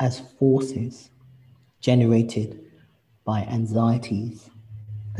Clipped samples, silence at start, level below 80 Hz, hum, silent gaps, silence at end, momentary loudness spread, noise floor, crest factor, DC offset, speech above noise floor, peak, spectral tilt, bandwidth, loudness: under 0.1%; 0 s; -54 dBFS; none; none; 0 s; 20 LU; -59 dBFS; 18 dB; under 0.1%; 36 dB; -6 dBFS; -8 dB/octave; 10.5 kHz; -23 LUFS